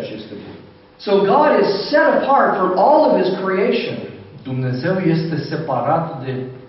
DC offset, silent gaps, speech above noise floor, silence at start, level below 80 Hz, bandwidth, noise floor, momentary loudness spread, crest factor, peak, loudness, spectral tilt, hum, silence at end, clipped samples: under 0.1%; none; 24 dB; 0 s; -58 dBFS; 6 kHz; -40 dBFS; 17 LU; 16 dB; -2 dBFS; -16 LUFS; -5 dB/octave; none; 0 s; under 0.1%